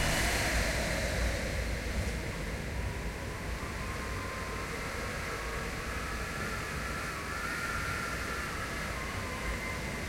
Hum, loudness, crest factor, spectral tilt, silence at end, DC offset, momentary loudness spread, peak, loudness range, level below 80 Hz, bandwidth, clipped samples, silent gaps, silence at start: none; -35 LUFS; 18 dB; -4 dB/octave; 0 s; under 0.1%; 7 LU; -18 dBFS; 3 LU; -40 dBFS; 16.5 kHz; under 0.1%; none; 0 s